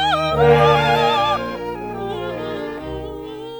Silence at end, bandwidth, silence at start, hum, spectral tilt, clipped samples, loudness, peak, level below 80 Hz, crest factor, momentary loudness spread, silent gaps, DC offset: 0 s; over 20 kHz; 0 s; none; -6 dB/octave; under 0.1%; -18 LUFS; 0 dBFS; -40 dBFS; 18 dB; 16 LU; none; under 0.1%